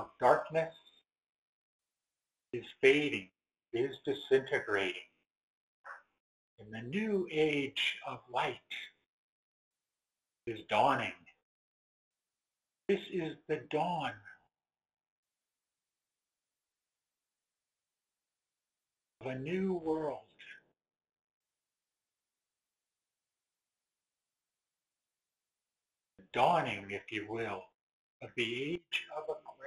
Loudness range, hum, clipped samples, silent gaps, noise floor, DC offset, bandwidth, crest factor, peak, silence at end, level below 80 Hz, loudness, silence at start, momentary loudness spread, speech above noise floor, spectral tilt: 8 LU; none; under 0.1%; 1.35-1.79 s, 5.37-5.84 s, 6.20-6.58 s, 9.06-9.71 s, 11.42-12.11 s, 15.10-15.23 s, 21.21-21.41 s, 27.75-28.20 s; under -90 dBFS; under 0.1%; 11.5 kHz; 26 dB; -12 dBFS; 0 s; -76 dBFS; -35 LUFS; 0 s; 18 LU; over 56 dB; -5.5 dB/octave